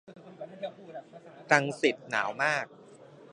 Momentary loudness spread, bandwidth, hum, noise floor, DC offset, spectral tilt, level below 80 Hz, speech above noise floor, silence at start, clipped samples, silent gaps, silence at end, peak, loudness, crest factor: 20 LU; 10.5 kHz; none; -52 dBFS; under 0.1%; -4 dB/octave; -82 dBFS; 24 dB; 0.1 s; under 0.1%; none; 0.05 s; -4 dBFS; -29 LUFS; 28 dB